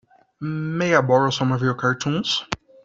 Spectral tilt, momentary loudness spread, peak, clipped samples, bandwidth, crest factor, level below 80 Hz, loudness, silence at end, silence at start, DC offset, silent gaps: -5 dB/octave; 12 LU; -2 dBFS; under 0.1%; 7.8 kHz; 18 dB; -58 dBFS; -21 LUFS; 0.3 s; 0.4 s; under 0.1%; none